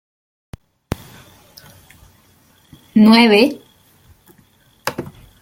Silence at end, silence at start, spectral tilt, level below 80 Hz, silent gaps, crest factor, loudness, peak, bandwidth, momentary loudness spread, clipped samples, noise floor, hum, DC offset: 0.35 s; 2.95 s; -5.5 dB/octave; -50 dBFS; none; 18 dB; -13 LUFS; 0 dBFS; 16.5 kHz; 23 LU; under 0.1%; -53 dBFS; none; under 0.1%